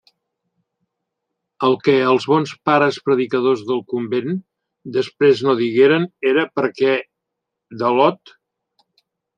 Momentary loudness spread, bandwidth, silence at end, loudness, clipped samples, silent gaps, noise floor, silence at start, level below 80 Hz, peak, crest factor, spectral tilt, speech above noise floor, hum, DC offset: 8 LU; 8.8 kHz; 1.2 s; -18 LUFS; under 0.1%; none; -80 dBFS; 1.6 s; -68 dBFS; -2 dBFS; 18 dB; -6.5 dB/octave; 63 dB; none; under 0.1%